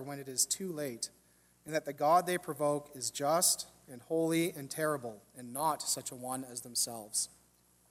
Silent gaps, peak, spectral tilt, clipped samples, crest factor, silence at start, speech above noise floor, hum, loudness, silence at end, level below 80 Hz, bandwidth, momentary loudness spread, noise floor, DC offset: none; -16 dBFS; -2.5 dB/octave; under 0.1%; 20 dB; 0 s; 33 dB; none; -33 LUFS; 0.65 s; -76 dBFS; 16 kHz; 12 LU; -68 dBFS; under 0.1%